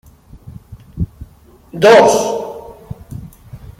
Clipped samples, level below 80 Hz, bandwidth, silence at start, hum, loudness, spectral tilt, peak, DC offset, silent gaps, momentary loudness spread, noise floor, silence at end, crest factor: under 0.1%; -38 dBFS; 16 kHz; 0.5 s; none; -12 LUFS; -4.5 dB/octave; 0 dBFS; under 0.1%; none; 26 LU; -43 dBFS; 0.2 s; 16 dB